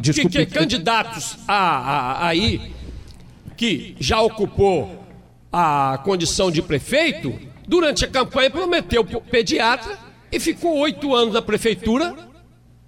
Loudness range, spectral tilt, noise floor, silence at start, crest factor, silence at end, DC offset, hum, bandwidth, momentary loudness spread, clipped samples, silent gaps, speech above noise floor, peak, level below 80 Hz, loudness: 2 LU; -4.5 dB/octave; -49 dBFS; 0 s; 14 dB; 0.6 s; under 0.1%; none; 16.5 kHz; 10 LU; under 0.1%; none; 30 dB; -6 dBFS; -40 dBFS; -19 LUFS